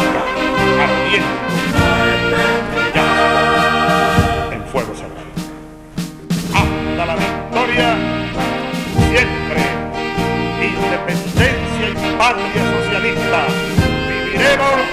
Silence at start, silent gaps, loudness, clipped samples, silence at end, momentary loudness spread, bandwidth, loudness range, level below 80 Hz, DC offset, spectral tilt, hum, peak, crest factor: 0 s; none; -15 LUFS; under 0.1%; 0 s; 9 LU; 15.5 kHz; 4 LU; -32 dBFS; under 0.1%; -5 dB/octave; none; 0 dBFS; 16 dB